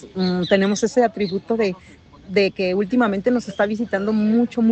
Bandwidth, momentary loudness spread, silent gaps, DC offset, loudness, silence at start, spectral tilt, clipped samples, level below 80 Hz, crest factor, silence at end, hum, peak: 8.6 kHz; 5 LU; none; under 0.1%; -20 LUFS; 0 s; -6 dB/octave; under 0.1%; -54 dBFS; 18 dB; 0 s; none; -2 dBFS